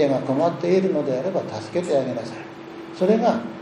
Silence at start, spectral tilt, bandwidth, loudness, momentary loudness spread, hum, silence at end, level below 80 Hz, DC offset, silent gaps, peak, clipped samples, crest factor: 0 s; -7 dB/octave; 10.5 kHz; -22 LUFS; 16 LU; none; 0 s; -68 dBFS; under 0.1%; none; -6 dBFS; under 0.1%; 16 dB